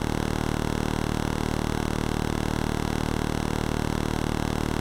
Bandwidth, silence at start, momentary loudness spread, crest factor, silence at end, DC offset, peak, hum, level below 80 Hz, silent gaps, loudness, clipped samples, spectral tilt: 17 kHz; 0 s; 0 LU; 14 dB; 0 s; under 0.1%; -12 dBFS; none; -34 dBFS; none; -28 LUFS; under 0.1%; -5.5 dB/octave